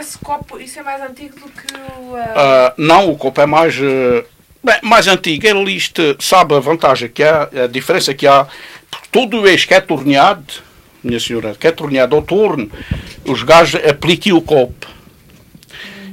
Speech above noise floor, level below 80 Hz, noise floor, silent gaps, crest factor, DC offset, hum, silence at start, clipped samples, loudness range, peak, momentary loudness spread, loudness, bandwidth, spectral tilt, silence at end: 31 dB; -42 dBFS; -43 dBFS; none; 12 dB; under 0.1%; none; 0 s; 0.2%; 3 LU; 0 dBFS; 19 LU; -12 LUFS; 16.5 kHz; -4 dB/octave; 0 s